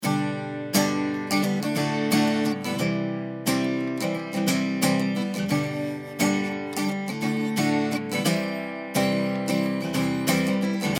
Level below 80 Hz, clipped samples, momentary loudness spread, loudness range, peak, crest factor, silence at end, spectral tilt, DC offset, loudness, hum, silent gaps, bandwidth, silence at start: -66 dBFS; under 0.1%; 5 LU; 1 LU; -6 dBFS; 18 dB; 0 s; -5 dB/octave; under 0.1%; -25 LUFS; none; none; 19.5 kHz; 0 s